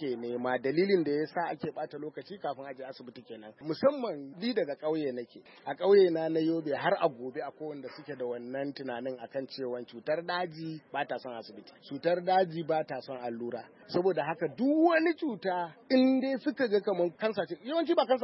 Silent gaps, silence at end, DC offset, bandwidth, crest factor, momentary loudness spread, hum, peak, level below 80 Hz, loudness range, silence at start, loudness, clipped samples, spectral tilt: none; 0 s; under 0.1%; 5.8 kHz; 18 dB; 16 LU; none; -12 dBFS; -82 dBFS; 8 LU; 0 s; -31 LUFS; under 0.1%; -9.5 dB/octave